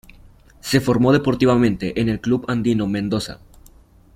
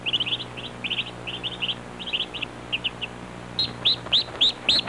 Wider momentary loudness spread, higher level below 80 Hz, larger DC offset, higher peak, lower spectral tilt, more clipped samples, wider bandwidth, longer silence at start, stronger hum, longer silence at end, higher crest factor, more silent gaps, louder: second, 8 LU vs 13 LU; first, -44 dBFS vs -52 dBFS; neither; first, -2 dBFS vs -8 dBFS; first, -6.5 dB/octave vs -2.5 dB/octave; neither; first, 16 kHz vs 11.5 kHz; first, 0.65 s vs 0 s; second, none vs 60 Hz at -45 dBFS; first, 0.8 s vs 0 s; about the same, 18 dB vs 18 dB; neither; first, -19 LUFS vs -25 LUFS